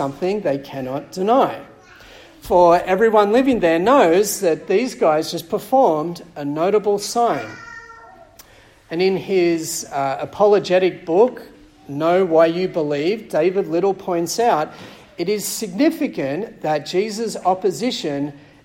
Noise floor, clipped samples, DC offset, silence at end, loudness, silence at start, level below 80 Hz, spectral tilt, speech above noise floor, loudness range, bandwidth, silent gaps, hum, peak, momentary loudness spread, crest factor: -47 dBFS; under 0.1%; under 0.1%; 0.25 s; -18 LUFS; 0 s; -54 dBFS; -4.5 dB/octave; 29 dB; 6 LU; 16.5 kHz; none; none; -2 dBFS; 13 LU; 18 dB